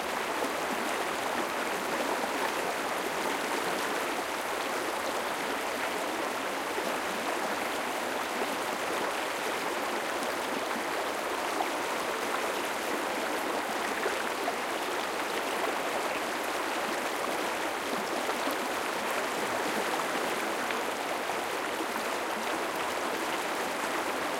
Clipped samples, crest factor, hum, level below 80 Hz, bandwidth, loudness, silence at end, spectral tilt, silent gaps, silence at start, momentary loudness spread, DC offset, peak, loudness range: under 0.1%; 18 dB; none; -68 dBFS; 17 kHz; -31 LUFS; 0 s; -2 dB/octave; none; 0 s; 1 LU; under 0.1%; -14 dBFS; 1 LU